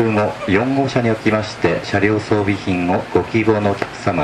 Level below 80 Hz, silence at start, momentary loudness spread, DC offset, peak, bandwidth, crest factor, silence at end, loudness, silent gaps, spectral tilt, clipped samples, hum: -46 dBFS; 0 s; 3 LU; under 0.1%; 0 dBFS; 11.5 kHz; 16 dB; 0 s; -17 LUFS; none; -6.5 dB/octave; under 0.1%; none